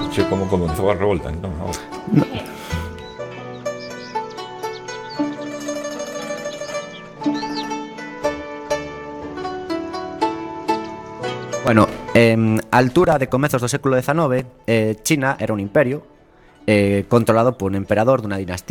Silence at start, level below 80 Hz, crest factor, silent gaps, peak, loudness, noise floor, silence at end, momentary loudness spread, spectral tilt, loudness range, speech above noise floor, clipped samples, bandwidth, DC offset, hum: 0 s; -44 dBFS; 20 dB; none; 0 dBFS; -20 LUFS; -49 dBFS; 0.1 s; 14 LU; -6 dB/octave; 10 LU; 31 dB; under 0.1%; 18 kHz; under 0.1%; none